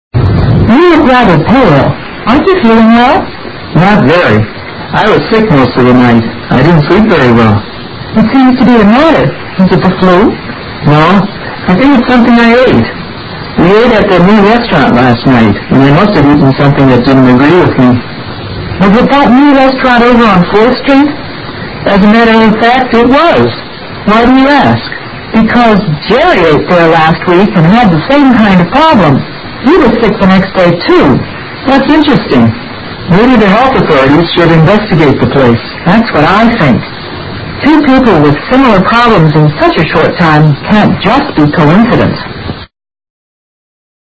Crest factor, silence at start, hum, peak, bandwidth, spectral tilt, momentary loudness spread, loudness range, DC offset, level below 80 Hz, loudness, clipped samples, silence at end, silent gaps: 6 dB; 0.15 s; none; 0 dBFS; 8 kHz; -8 dB/octave; 11 LU; 2 LU; under 0.1%; -28 dBFS; -5 LUFS; 5%; 1.5 s; none